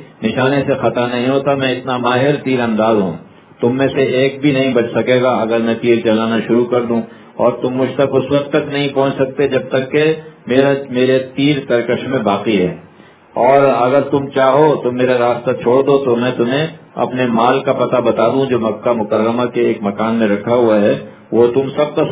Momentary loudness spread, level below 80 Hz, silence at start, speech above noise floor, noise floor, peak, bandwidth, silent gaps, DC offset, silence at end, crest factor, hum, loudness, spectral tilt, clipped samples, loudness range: 5 LU; -52 dBFS; 0 s; 29 dB; -42 dBFS; 0 dBFS; 4 kHz; none; under 0.1%; 0 s; 14 dB; none; -14 LUFS; -10.5 dB/octave; under 0.1%; 2 LU